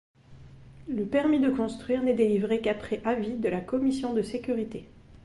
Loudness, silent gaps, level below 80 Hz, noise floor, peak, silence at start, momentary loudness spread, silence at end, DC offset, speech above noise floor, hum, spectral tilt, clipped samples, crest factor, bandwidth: -28 LUFS; none; -56 dBFS; -49 dBFS; -12 dBFS; 0.3 s; 9 LU; 0.05 s; under 0.1%; 22 dB; none; -7 dB/octave; under 0.1%; 16 dB; 11.5 kHz